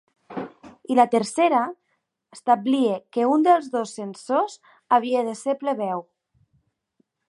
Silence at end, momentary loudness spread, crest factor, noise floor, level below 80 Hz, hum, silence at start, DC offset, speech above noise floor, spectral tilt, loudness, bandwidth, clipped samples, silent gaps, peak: 1.25 s; 16 LU; 20 dB; -74 dBFS; -76 dBFS; none; 0.3 s; under 0.1%; 52 dB; -5 dB/octave; -22 LUFS; 11.5 kHz; under 0.1%; none; -4 dBFS